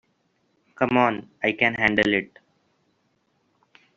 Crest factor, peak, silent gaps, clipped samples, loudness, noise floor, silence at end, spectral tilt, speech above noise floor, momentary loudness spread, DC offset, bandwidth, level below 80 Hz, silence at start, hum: 22 dB; -4 dBFS; none; under 0.1%; -22 LUFS; -69 dBFS; 1.7 s; -3 dB/octave; 47 dB; 7 LU; under 0.1%; 7.6 kHz; -60 dBFS; 0.8 s; none